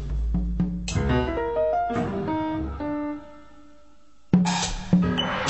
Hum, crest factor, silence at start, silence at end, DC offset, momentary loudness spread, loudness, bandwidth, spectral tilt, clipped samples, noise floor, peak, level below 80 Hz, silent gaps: none; 18 dB; 0 s; 0 s; 0.3%; 8 LU; -25 LUFS; 8.4 kHz; -5.5 dB/octave; under 0.1%; -58 dBFS; -6 dBFS; -34 dBFS; none